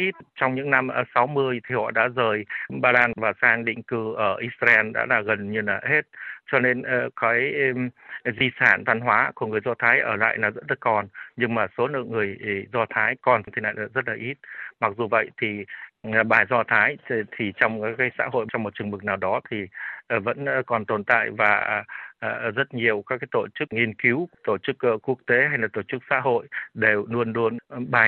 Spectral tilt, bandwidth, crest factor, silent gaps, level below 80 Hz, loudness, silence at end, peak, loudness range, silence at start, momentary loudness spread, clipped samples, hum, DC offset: -7.5 dB/octave; 7 kHz; 20 dB; none; -68 dBFS; -23 LUFS; 0 s; -4 dBFS; 4 LU; 0 s; 10 LU; under 0.1%; none; under 0.1%